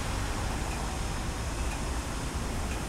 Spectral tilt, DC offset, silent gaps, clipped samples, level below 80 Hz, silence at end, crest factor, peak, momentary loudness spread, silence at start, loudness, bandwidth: -4.5 dB/octave; under 0.1%; none; under 0.1%; -34 dBFS; 0 s; 14 dB; -18 dBFS; 1 LU; 0 s; -34 LUFS; 16 kHz